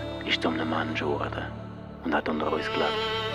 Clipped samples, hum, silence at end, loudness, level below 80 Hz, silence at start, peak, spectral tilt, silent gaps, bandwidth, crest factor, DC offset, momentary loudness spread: under 0.1%; none; 0 s; -28 LUFS; -50 dBFS; 0 s; -12 dBFS; -5.5 dB/octave; none; 13.5 kHz; 18 dB; under 0.1%; 10 LU